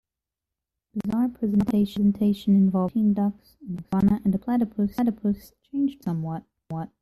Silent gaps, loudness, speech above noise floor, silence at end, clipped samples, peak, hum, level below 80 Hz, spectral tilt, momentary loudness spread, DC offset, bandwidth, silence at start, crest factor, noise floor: none; -24 LUFS; 64 dB; 0.15 s; under 0.1%; -12 dBFS; none; -54 dBFS; -9 dB/octave; 14 LU; under 0.1%; 13 kHz; 0.95 s; 12 dB; -88 dBFS